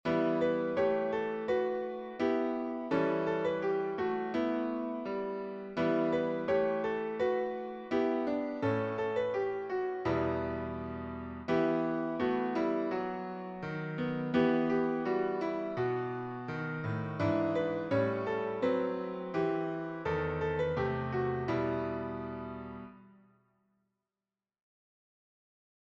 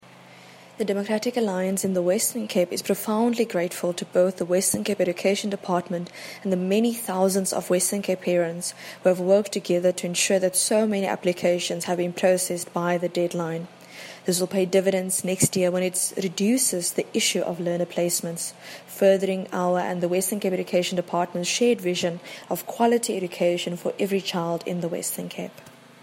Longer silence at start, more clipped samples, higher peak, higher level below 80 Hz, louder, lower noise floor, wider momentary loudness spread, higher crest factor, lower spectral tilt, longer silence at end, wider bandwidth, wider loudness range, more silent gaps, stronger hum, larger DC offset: second, 0.05 s vs 0.2 s; neither; second, -16 dBFS vs -4 dBFS; first, -60 dBFS vs -70 dBFS; second, -33 LUFS vs -24 LUFS; first, under -90 dBFS vs -48 dBFS; about the same, 9 LU vs 9 LU; about the same, 18 dB vs 20 dB; first, -8.5 dB/octave vs -4 dB/octave; first, 2.85 s vs 0.3 s; second, 7.2 kHz vs 16.5 kHz; about the same, 3 LU vs 3 LU; neither; neither; neither